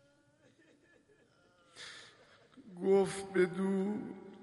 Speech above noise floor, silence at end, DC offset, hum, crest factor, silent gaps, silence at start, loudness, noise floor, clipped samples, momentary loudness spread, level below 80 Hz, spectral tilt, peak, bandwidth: 34 dB; 0 s; under 0.1%; none; 18 dB; none; 1.75 s; -33 LUFS; -68 dBFS; under 0.1%; 22 LU; -78 dBFS; -6 dB/octave; -18 dBFS; 11.5 kHz